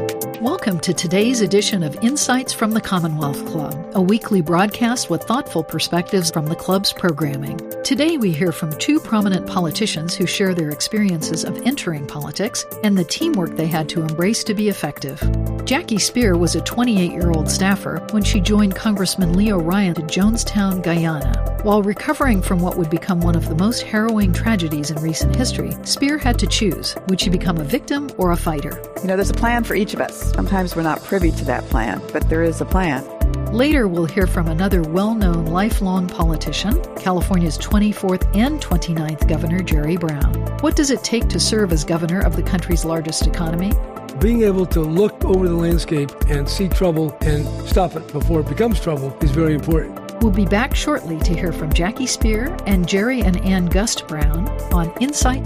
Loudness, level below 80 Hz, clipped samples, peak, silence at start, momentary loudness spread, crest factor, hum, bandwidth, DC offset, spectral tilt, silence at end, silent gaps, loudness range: -19 LUFS; -24 dBFS; under 0.1%; -2 dBFS; 0 s; 5 LU; 14 dB; none; 15.5 kHz; under 0.1%; -5 dB/octave; 0 s; none; 2 LU